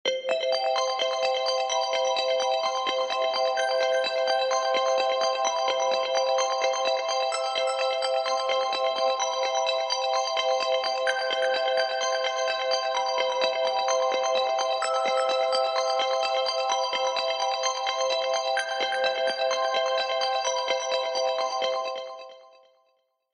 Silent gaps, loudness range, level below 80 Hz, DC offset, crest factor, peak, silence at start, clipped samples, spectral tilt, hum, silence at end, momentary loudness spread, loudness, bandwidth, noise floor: none; 1 LU; under -90 dBFS; under 0.1%; 16 dB; -10 dBFS; 0.05 s; under 0.1%; 1.5 dB/octave; none; 0.9 s; 2 LU; -25 LUFS; 10 kHz; -71 dBFS